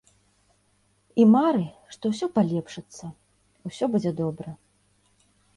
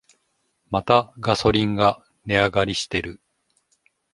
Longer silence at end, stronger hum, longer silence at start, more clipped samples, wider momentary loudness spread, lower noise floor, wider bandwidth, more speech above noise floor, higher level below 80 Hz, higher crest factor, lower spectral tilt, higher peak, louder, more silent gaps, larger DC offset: about the same, 1 s vs 0.95 s; first, 50 Hz at -50 dBFS vs none; first, 1.15 s vs 0.7 s; neither; first, 23 LU vs 9 LU; second, -66 dBFS vs -71 dBFS; about the same, 11 kHz vs 11.5 kHz; second, 43 dB vs 50 dB; second, -66 dBFS vs -46 dBFS; about the same, 20 dB vs 22 dB; first, -7.5 dB/octave vs -5 dB/octave; second, -8 dBFS vs -2 dBFS; second, -24 LUFS vs -21 LUFS; neither; neither